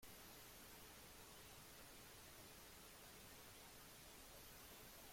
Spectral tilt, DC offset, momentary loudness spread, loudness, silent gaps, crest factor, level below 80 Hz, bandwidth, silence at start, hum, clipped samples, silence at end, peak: -2 dB/octave; under 0.1%; 1 LU; -60 LUFS; none; 12 dB; -72 dBFS; 16.5 kHz; 0 s; none; under 0.1%; 0 s; -48 dBFS